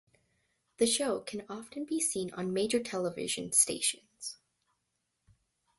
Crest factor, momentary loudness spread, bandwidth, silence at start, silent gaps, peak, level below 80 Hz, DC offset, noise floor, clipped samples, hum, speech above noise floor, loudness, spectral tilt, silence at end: 24 dB; 16 LU; 12 kHz; 0.8 s; none; -12 dBFS; -72 dBFS; under 0.1%; -82 dBFS; under 0.1%; none; 49 dB; -31 LUFS; -2.5 dB/octave; 1.45 s